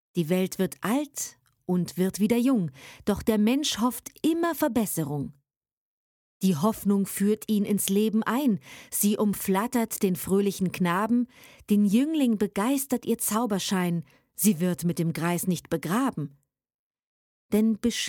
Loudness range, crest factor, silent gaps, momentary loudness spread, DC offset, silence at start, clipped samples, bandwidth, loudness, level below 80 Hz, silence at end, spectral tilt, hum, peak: 3 LU; 20 dB; 5.56-5.61 s, 5.72-6.41 s, 16.74-16.91 s, 17.04-17.49 s; 7 LU; under 0.1%; 0.15 s; under 0.1%; 19.5 kHz; -26 LUFS; -60 dBFS; 0 s; -5 dB/octave; none; -6 dBFS